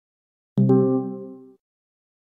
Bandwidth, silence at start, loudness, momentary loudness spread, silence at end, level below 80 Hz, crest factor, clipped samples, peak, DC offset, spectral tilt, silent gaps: 3.5 kHz; 0.55 s; -21 LUFS; 19 LU; 1 s; -74 dBFS; 18 dB; under 0.1%; -8 dBFS; under 0.1%; -13 dB/octave; none